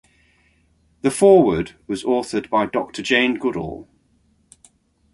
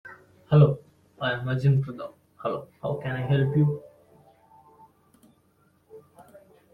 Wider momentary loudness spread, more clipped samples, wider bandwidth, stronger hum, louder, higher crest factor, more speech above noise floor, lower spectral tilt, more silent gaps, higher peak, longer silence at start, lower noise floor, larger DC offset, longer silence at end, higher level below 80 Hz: about the same, 15 LU vs 17 LU; neither; first, 11.5 kHz vs 4.7 kHz; neither; first, -19 LUFS vs -25 LUFS; about the same, 20 dB vs 22 dB; about the same, 43 dB vs 41 dB; second, -5 dB/octave vs -9.5 dB/octave; neither; first, -2 dBFS vs -6 dBFS; first, 1.05 s vs 0.05 s; about the same, -61 dBFS vs -64 dBFS; neither; first, 1.3 s vs 0.75 s; first, -50 dBFS vs -60 dBFS